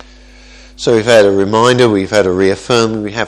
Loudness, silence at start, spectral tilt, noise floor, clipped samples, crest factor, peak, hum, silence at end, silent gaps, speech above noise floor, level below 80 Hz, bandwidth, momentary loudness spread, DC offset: -11 LUFS; 0.8 s; -5 dB/octave; -38 dBFS; 0.3%; 12 dB; 0 dBFS; none; 0 s; none; 28 dB; -42 dBFS; 12.5 kHz; 5 LU; under 0.1%